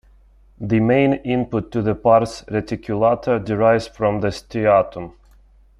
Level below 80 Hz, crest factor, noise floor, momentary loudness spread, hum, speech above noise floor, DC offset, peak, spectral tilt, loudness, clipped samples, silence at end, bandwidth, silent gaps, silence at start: -46 dBFS; 18 dB; -50 dBFS; 10 LU; none; 32 dB; under 0.1%; -2 dBFS; -7.5 dB/octave; -19 LUFS; under 0.1%; 0.7 s; 11.5 kHz; none; 0.6 s